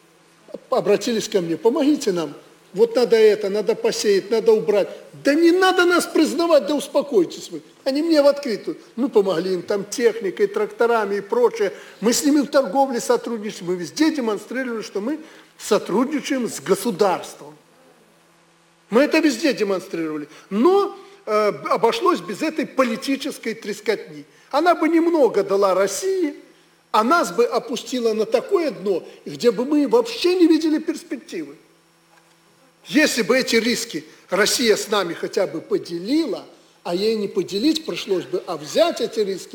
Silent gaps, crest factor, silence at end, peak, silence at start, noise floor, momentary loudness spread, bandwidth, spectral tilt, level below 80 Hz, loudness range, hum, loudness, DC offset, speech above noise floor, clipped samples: none; 16 dB; 0.1 s; -4 dBFS; 0.55 s; -56 dBFS; 11 LU; 19.5 kHz; -4 dB/octave; -68 dBFS; 5 LU; none; -20 LUFS; under 0.1%; 36 dB; under 0.1%